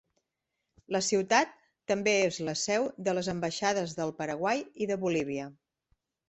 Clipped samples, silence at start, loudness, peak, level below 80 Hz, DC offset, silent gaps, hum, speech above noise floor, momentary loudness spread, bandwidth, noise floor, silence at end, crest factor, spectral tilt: under 0.1%; 0.9 s; -30 LUFS; -10 dBFS; -70 dBFS; under 0.1%; none; none; 55 dB; 9 LU; 8.4 kHz; -85 dBFS; 0.75 s; 20 dB; -3.5 dB/octave